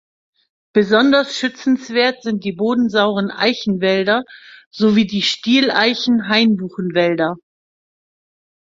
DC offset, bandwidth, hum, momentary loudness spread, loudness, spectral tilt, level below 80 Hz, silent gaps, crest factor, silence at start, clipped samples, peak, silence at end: under 0.1%; 7.8 kHz; none; 8 LU; -16 LUFS; -5 dB/octave; -60 dBFS; 4.66-4.71 s; 16 dB; 0.75 s; under 0.1%; -2 dBFS; 1.35 s